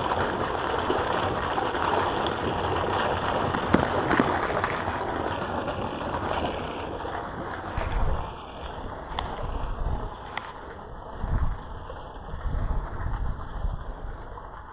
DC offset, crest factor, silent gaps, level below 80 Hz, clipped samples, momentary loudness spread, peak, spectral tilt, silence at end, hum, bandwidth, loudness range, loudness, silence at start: under 0.1%; 24 dB; none; -36 dBFS; under 0.1%; 15 LU; -4 dBFS; -10 dB/octave; 0 s; none; 4 kHz; 9 LU; -29 LUFS; 0 s